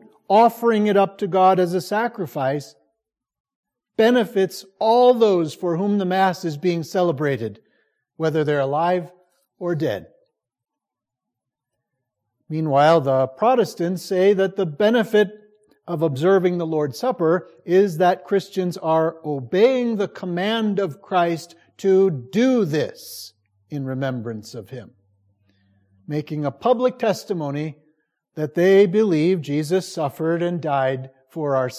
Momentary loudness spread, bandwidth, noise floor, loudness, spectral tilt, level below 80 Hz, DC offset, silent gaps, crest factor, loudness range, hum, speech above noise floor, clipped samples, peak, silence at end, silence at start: 13 LU; 15.5 kHz; -85 dBFS; -20 LUFS; -6.5 dB/octave; -68 dBFS; under 0.1%; 3.40-3.45 s, 3.55-3.63 s; 16 dB; 7 LU; none; 66 dB; under 0.1%; -4 dBFS; 0 s; 0.3 s